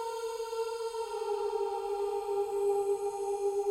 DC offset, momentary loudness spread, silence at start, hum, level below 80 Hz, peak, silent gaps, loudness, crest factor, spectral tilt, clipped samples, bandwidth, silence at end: under 0.1%; 6 LU; 0 s; none; -68 dBFS; -22 dBFS; none; -34 LUFS; 12 dB; -3 dB/octave; under 0.1%; 16 kHz; 0 s